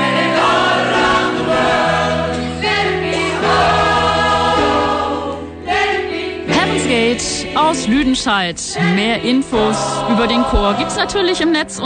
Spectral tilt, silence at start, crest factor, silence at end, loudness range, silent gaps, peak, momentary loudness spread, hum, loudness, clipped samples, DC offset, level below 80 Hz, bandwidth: -4 dB/octave; 0 s; 14 dB; 0 s; 1 LU; none; -2 dBFS; 5 LU; none; -15 LUFS; under 0.1%; under 0.1%; -34 dBFS; 9.6 kHz